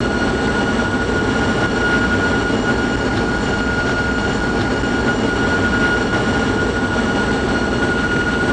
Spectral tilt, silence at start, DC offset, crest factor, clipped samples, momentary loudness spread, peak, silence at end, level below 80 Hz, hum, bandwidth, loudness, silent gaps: -5.5 dB/octave; 0 s; under 0.1%; 10 dB; under 0.1%; 2 LU; -6 dBFS; 0 s; -30 dBFS; none; 9.8 kHz; -17 LUFS; none